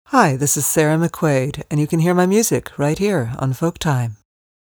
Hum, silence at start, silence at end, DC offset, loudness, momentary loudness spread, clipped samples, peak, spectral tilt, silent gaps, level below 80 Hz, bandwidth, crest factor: none; 0.1 s; 0.45 s; under 0.1%; -18 LUFS; 7 LU; under 0.1%; 0 dBFS; -5 dB/octave; none; -48 dBFS; over 20 kHz; 18 dB